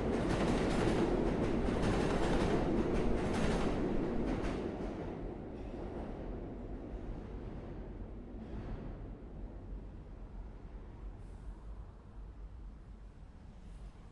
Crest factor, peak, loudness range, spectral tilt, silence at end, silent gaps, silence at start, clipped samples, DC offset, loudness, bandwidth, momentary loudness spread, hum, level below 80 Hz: 18 dB; -18 dBFS; 18 LU; -7 dB/octave; 0 s; none; 0 s; under 0.1%; under 0.1%; -37 LUFS; 11.5 kHz; 20 LU; none; -44 dBFS